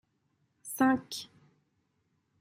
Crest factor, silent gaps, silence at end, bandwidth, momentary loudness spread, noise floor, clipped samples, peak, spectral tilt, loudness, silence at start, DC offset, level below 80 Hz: 20 dB; none; 1.15 s; 16 kHz; 22 LU; -76 dBFS; under 0.1%; -14 dBFS; -3.5 dB/octave; -31 LUFS; 0.65 s; under 0.1%; -76 dBFS